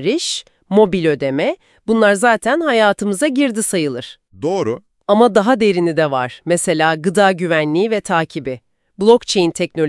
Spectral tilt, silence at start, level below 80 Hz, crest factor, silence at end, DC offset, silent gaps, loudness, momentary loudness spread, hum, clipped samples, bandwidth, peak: -4.5 dB/octave; 0 s; -54 dBFS; 16 dB; 0 s; under 0.1%; none; -16 LUFS; 11 LU; none; under 0.1%; 12 kHz; 0 dBFS